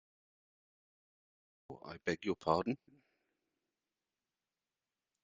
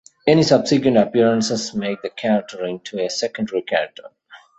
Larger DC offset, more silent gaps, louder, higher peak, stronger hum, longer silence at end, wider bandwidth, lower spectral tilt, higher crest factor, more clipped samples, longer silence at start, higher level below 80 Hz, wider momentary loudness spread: neither; neither; second, -38 LUFS vs -19 LUFS; second, -16 dBFS vs -2 dBFS; neither; first, 2.45 s vs 0.2 s; second, 7.4 kHz vs 8.2 kHz; about the same, -4.5 dB/octave vs -5 dB/octave; first, 28 dB vs 18 dB; neither; first, 1.7 s vs 0.25 s; second, -76 dBFS vs -58 dBFS; first, 18 LU vs 11 LU